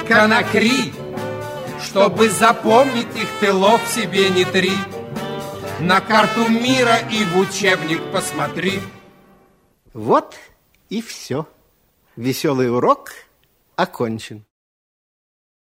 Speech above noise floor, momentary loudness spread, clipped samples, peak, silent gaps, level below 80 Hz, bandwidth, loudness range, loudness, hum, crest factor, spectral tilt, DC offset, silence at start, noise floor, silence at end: 43 dB; 14 LU; under 0.1%; 0 dBFS; none; -56 dBFS; 16 kHz; 8 LU; -17 LUFS; none; 18 dB; -4 dB/octave; under 0.1%; 0 s; -60 dBFS; 1.35 s